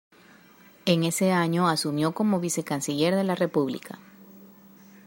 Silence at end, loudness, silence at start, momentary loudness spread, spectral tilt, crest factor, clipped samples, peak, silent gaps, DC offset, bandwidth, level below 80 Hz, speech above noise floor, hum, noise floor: 0.6 s; -25 LUFS; 0.85 s; 8 LU; -5 dB/octave; 18 dB; under 0.1%; -8 dBFS; none; under 0.1%; 16 kHz; -70 dBFS; 29 dB; none; -54 dBFS